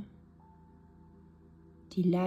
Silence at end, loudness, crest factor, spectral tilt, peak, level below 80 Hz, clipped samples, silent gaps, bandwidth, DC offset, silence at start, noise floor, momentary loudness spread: 0 s; -33 LUFS; 18 dB; -9 dB/octave; -18 dBFS; -64 dBFS; under 0.1%; none; 7.6 kHz; under 0.1%; 0 s; -58 dBFS; 26 LU